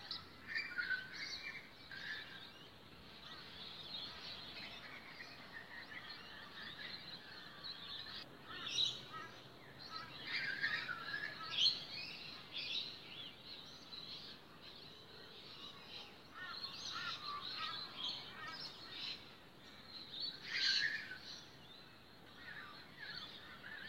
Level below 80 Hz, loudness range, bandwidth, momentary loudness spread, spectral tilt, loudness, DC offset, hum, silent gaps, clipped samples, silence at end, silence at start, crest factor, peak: -76 dBFS; 10 LU; 16 kHz; 17 LU; -1.5 dB/octave; -44 LUFS; under 0.1%; none; none; under 0.1%; 0 s; 0 s; 26 dB; -20 dBFS